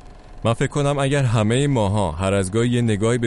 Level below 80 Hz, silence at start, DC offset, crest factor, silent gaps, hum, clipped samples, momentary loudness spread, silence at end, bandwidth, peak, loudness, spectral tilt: -38 dBFS; 0.05 s; under 0.1%; 14 dB; none; none; under 0.1%; 3 LU; 0 s; 11.5 kHz; -6 dBFS; -20 LUFS; -6 dB/octave